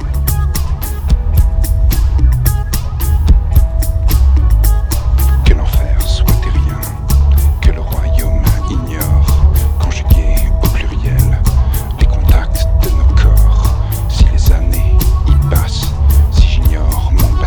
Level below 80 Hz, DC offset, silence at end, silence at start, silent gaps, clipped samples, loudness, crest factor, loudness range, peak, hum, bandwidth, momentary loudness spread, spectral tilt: -10 dBFS; under 0.1%; 0 s; 0 s; none; 0.3%; -13 LUFS; 10 dB; 1 LU; 0 dBFS; none; over 20 kHz; 6 LU; -6 dB/octave